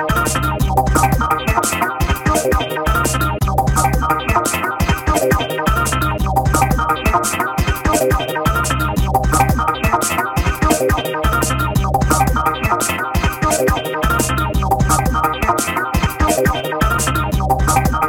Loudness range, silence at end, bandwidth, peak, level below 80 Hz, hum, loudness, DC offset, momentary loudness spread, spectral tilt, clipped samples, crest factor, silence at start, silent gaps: 0 LU; 0 s; 18 kHz; 0 dBFS; -22 dBFS; none; -16 LUFS; 0.2%; 3 LU; -4.5 dB/octave; under 0.1%; 14 dB; 0 s; none